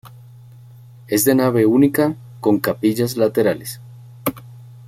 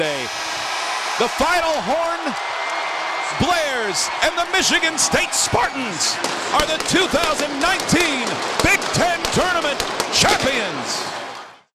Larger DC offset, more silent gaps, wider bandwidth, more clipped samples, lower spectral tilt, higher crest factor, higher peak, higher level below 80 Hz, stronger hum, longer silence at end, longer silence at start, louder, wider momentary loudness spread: neither; neither; about the same, 16.5 kHz vs 17.5 kHz; neither; first, -5.5 dB/octave vs -2 dB/octave; about the same, 18 dB vs 20 dB; about the same, -2 dBFS vs 0 dBFS; second, -56 dBFS vs -42 dBFS; neither; about the same, 0.15 s vs 0.2 s; about the same, 0.05 s vs 0 s; about the same, -18 LUFS vs -19 LUFS; first, 12 LU vs 7 LU